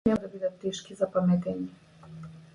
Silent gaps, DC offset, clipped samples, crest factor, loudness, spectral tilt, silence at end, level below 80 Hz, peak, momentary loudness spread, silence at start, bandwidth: none; under 0.1%; under 0.1%; 20 dB; -30 LUFS; -7 dB/octave; 0.15 s; -58 dBFS; -10 dBFS; 20 LU; 0.05 s; 10.5 kHz